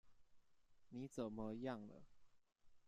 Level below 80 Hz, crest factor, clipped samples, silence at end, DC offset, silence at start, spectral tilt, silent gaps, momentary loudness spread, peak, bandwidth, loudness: -74 dBFS; 20 dB; under 0.1%; 0 s; under 0.1%; 0.05 s; -7 dB/octave; none; 12 LU; -34 dBFS; 13 kHz; -50 LUFS